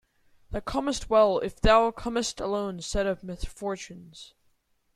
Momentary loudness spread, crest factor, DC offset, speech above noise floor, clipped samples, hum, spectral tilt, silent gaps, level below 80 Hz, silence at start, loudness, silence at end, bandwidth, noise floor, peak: 17 LU; 20 dB; under 0.1%; 42 dB; under 0.1%; none; -4.5 dB/octave; none; -40 dBFS; 0.5 s; -26 LUFS; 0.7 s; 13 kHz; -69 dBFS; -8 dBFS